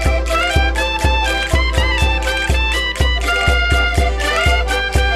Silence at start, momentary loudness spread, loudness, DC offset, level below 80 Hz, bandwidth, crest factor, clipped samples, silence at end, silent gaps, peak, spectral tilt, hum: 0 s; 2 LU; -15 LUFS; under 0.1%; -18 dBFS; 14 kHz; 14 dB; under 0.1%; 0 s; none; 0 dBFS; -4 dB/octave; none